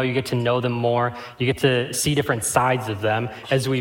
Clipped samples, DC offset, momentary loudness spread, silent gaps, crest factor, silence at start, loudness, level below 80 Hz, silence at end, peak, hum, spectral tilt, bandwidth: under 0.1%; under 0.1%; 5 LU; none; 20 dB; 0 s; -22 LUFS; -54 dBFS; 0 s; -2 dBFS; none; -4.5 dB/octave; 17 kHz